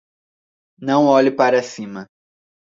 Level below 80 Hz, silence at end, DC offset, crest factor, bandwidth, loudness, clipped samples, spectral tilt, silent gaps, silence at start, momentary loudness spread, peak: -66 dBFS; 0.65 s; under 0.1%; 18 dB; 7.8 kHz; -16 LUFS; under 0.1%; -5.5 dB/octave; none; 0.8 s; 18 LU; -2 dBFS